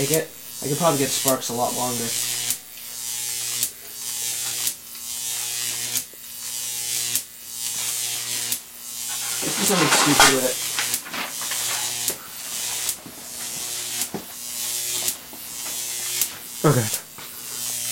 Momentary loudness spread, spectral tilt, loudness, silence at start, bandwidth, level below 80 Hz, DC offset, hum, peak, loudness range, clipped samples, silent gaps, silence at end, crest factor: 11 LU; -2 dB/octave; -23 LUFS; 0 s; 16.5 kHz; -58 dBFS; under 0.1%; none; 0 dBFS; 7 LU; under 0.1%; none; 0 s; 24 dB